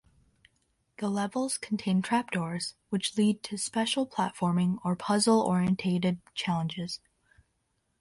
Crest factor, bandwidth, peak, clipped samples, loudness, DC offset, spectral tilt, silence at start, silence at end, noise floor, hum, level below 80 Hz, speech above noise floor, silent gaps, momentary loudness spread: 16 dB; 11.5 kHz; -14 dBFS; under 0.1%; -29 LUFS; under 0.1%; -5 dB/octave; 1 s; 1.05 s; -76 dBFS; none; -66 dBFS; 48 dB; none; 9 LU